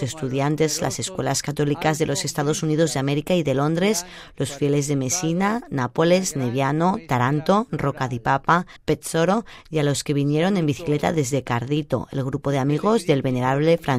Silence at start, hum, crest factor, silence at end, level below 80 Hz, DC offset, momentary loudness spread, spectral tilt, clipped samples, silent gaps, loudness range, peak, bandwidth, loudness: 0 s; none; 18 dB; 0 s; -50 dBFS; under 0.1%; 6 LU; -5 dB/octave; under 0.1%; none; 1 LU; -4 dBFS; 16 kHz; -22 LUFS